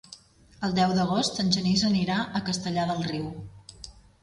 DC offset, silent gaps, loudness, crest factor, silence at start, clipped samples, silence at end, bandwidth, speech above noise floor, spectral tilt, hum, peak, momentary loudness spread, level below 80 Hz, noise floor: under 0.1%; none; -26 LUFS; 18 dB; 0.1 s; under 0.1%; 0.25 s; 11.5 kHz; 26 dB; -5 dB/octave; none; -8 dBFS; 21 LU; -54 dBFS; -51 dBFS